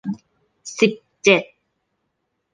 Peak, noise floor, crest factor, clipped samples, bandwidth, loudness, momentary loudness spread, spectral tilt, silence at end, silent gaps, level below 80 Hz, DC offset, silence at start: -2 dBFS; -74 dBFS; 22 dB; under 0.1%; 9.8 kHz; -18 LUFS; 18 LU; -4 dB/octave; 1.1 s; none; -66 dBFS; under 0.1%; 0.05 s